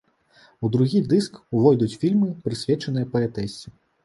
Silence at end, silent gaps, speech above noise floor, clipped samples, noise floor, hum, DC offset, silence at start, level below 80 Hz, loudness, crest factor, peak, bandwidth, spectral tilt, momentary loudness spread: 0.35 s; none; 35 dB; under 0.1%; -56 dBFS; none; under 0.1%; 0.6 s; -56 dBFS; -22 LUFS; 18 dB; -4 dBFS; 11.5 kHz; -7.5 dB/octave; 10 LU